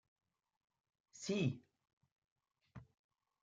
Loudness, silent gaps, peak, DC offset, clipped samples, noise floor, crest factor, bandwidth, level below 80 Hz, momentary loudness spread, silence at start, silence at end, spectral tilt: -42 LUFS; 1.93-2.01 s, 2.12-2.22 s, 2.32-2.36 s; -26 dBFS; under 0.1%; under 0.1%; -61 dBFS; 22 dB; 9 kHz; -80 dBFS; 23 LU; 1.15 s; 0.6 s; -5.5 dB/octave